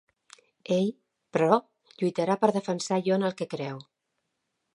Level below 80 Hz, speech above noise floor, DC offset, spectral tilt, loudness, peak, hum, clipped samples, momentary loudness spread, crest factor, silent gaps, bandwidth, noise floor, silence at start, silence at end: -78 dBFS; 54 dB; under 0.1%; -6 dB/octave; -27 LUFS; -6 dBFS; none; under 0.1%; 11 LU; 24 dB; none; 11.5 kHz; -80 dBFS; 0.7 s; 0.95 s